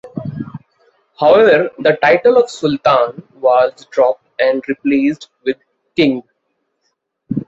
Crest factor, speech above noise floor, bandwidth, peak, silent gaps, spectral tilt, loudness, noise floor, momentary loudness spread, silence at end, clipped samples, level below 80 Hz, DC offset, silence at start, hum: 14 dB; 56 dB; 8 kHz; 0 dBFS; none; -6 dB/octave; -14 LUFS; -69 dBFS; 15 LU; 0.05 s; under 0.1%; -56 dBFS; under 0.1%; 0.05 s; none